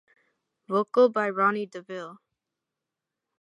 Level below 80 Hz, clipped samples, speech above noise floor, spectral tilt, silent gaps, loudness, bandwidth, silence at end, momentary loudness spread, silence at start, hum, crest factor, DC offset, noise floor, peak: -86 dBFS; under 0.1%; 62 dB; -6.5 dB/octave; none; -25 LUFS; 7.8 kHz; 1.25 s; 17 LU; 0.7 s; none; 20 dB; under 0.1%; -87 dBFS; -10 dBFS